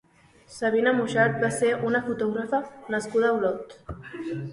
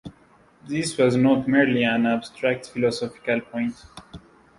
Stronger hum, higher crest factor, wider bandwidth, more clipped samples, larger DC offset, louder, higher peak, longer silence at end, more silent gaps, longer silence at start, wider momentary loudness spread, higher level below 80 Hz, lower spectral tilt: neither; about the same, 18 dB vs 18 dB; about the same, 11.5 kHz vs 11.5 kHz; neither; neither; second, -25 LUFS vs -22 LUFS; about the same, -8 dBFS vs -6 dBFS; second, 0 s vs 0.4 s; neither; first, 0.5 s vs 0.05 s; about the same, 14 LU vs 12 LU; about the same, -56 dBFS vs -58 dBFS; about the same, -5.5 dB/octave vs -5.5 dB/octave